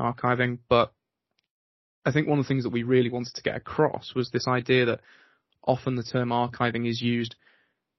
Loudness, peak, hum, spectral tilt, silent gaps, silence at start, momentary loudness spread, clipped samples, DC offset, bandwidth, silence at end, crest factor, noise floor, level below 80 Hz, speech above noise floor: -26 LUFS; -6 dBFS; none; -5 dB/octave; 1.50-2.02 s; 0 s; 8 LU; under 0.1%; under 0.1%; 6.2 kHz; 0.7 s; 20 dB; -78 dBFS; -60 dBFS; 52 dB